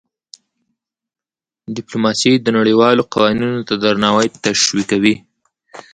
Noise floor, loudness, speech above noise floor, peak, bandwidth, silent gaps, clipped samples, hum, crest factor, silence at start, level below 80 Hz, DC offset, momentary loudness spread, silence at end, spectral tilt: under -90 dBFS; -14 LUFS; over 76 dB; 0 dBFS; 9.4 kHz; none; under 0.1%; none; 16 dB; 1.7 s; -54 dBFS; under 0.1%; 8 LU; 0.15 s; -4 dB/octave